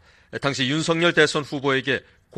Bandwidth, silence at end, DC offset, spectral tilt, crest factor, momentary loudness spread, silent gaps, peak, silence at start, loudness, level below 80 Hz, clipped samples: 11 kHz; 0.4 s; under 0.1%; -4 dB/octave; 20 dB; 10 LU; none; -2 dBFS; 0.3 s; -21 LUFS; -58 dBFS; under 0.1%